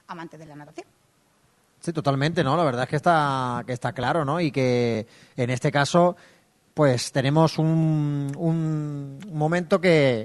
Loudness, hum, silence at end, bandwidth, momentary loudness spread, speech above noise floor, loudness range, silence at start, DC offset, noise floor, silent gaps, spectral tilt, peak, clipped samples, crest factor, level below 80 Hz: -23 LUFS; none; 0 s; 12 kHz; 16 LU; 40 dB; 2 LU; 0.1 s; under 0.1%; -63 dBFS; none; -6.5 dB/octave; -4 dBFS; under 0.1%; 18 dB; -60 dBFS